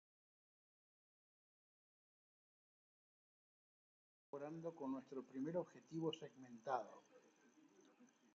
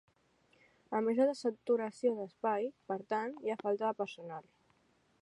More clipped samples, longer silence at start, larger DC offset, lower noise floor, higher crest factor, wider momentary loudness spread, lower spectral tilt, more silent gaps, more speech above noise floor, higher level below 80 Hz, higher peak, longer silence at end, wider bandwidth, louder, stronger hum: neither; first, 4.35 s vs 0.9 s; neither; about the same, -72 dBFS vs -72 dBFS; first, 24 dB vs 18 dB; about the same, 11 LU vs 10 LU; about the same, -5.5 dB/octave vs -6 dB/octave; neither; second, 24 dB vs 38 dB; about the same, under -90 dBFS vs -86 dBFS; second, -30 dBFS vs -18 dBFS; second, 0.3 s vs 0.8 s; second, 7.4 kHz vs 11 kHz; second, -49 LUFS vs -35 LUFS; neither